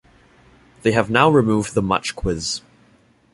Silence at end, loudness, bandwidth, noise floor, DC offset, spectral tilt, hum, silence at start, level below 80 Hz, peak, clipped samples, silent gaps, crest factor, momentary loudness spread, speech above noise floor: 0.75 s; -19 LUFS; 11.5 kHz; -55 dBFS; under 0.1%; -5 dB/octave; none; 0.85 s; -40 dBFS; -2 dBFS; under 0.1%; none; 20 dB; 10 LU; 37 dB